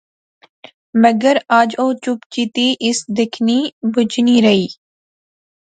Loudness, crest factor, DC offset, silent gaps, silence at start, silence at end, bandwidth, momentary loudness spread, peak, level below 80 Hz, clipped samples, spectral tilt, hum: -15 LUFS; 16 dB; under 0.1%; 2.26-2.30 s, 3.73-3.81 s; 0.95 s; 1.05 s; 9.2 kHz; 9 LU; 0 dBFS; -62 dBFS; under 0.1%; -4.5 dB/octave; none